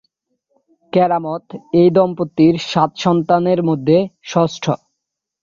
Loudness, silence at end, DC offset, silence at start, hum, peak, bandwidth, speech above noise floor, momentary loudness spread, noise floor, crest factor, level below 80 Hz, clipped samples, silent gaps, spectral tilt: -16 LUFS; 0.65 s; under 0.1%; 0.95 s; none; -2 dBFS; 7.4 kHz; 63 dB; 9 LU; -78 dBFS; 16 dB; -58 dBFS; under 0.1%; none; -7 dB/octave